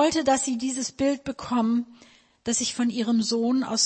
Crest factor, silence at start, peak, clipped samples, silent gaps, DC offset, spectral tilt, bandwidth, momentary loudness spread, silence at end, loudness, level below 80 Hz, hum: 16 dB; 0 s; -10 dBFS; under 0.1%; none; under 0.1%; -3 dB/octave; 8.8 kHz; 6 LU; 0 s; -25 LUFS; -60 dBFS; none